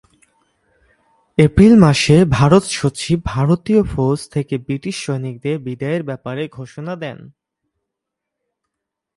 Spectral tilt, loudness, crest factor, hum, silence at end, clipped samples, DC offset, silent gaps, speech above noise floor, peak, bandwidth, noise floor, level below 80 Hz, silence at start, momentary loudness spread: -6.5 dB/octave; -16 LUFS; 18 dB; none; 1.9 s; under 0.1%; under 0.1%; none; 65 dB; 0 dBFS; 11.5 kHz; -80 dBFS; -38 dBFS; 1.4 s; 16 LU